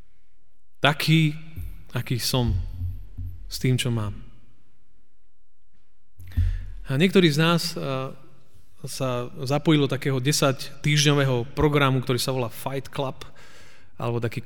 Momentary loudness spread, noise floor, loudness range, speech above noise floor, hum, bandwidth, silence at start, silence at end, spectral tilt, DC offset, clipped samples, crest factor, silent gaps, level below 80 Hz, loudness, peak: 17 LU; -67 dBFS; 9 LU; 45 dB; none; 19 kHz; 0.85 s; 0.05 s; -5 dB/octave; 2%; under 0.1%; 22 dB; none; -40 dBFS; -24 LUFS; -4 dBFS